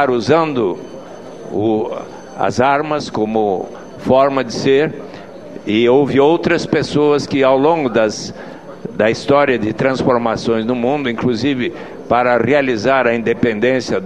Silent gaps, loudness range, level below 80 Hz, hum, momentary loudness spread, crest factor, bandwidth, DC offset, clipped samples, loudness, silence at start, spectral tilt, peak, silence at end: none; 3 LU; -48 dBFS; none; 16 LU; 16 dB; 10 kHz; 0.5%; under 0.1%; -15 LUFS; 0 s; -6 dB/octave; 0 dBFS; 0 s